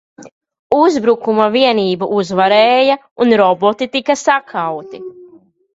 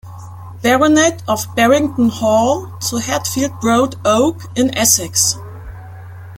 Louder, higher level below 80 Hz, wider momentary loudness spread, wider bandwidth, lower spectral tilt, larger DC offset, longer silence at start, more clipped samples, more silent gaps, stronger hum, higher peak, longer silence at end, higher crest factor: about the same, -13 LUFS vs -14 LUFS; second, -58 dBFS vs -46 dBFS; second, 11 LU vs 22 LU; second, 8 kHz vs 17 kHz; about the same, -4.5 dB/octave vs -3.5 dB/octave; neither; first, 0.2 s vs 0.05 s; neither; first, 0.32-0.41 s, 0.59-0.70 s, 3.11-3.16 s vs none; neither; about the same, 0 dBFS vs 0 dBFS; first, 0.5 s vs 0 s; about the same, 14 dB vs 16 dB